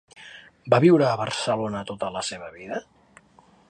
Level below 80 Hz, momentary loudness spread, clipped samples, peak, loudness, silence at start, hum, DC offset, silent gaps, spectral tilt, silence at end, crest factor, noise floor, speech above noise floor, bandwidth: -62 dBFS; 25 LU; under 0.1%; -4 dBFS; -23 LUFS; 0.2 s; none; under 0.1%; none; -5.5 dB/octave; 0.9 s; 22 dB; -56 dBFS; 34 dB; 9.6 kHz